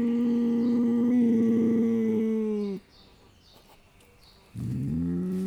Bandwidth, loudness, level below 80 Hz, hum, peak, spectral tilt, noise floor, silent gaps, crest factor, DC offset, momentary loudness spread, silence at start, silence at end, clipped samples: 6.6 kHz; -26 LUFS; -56 dBFS; none; -16 dBFS; -9 dB/octave; -56 dBFS; none; 10 dB; under 0.1%; 12 LU; 0 s; 0 s; under 0.1%